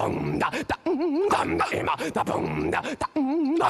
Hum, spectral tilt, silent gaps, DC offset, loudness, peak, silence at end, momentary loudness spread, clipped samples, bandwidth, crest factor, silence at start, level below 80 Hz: none; -5.5 dB/octave; none; under 0.1%; -26 LUFS; -10 dBFS; 0 s; 4 LU; under 0.1%; 13.5 kHz; 14 dB; 0 s; -52 dBFS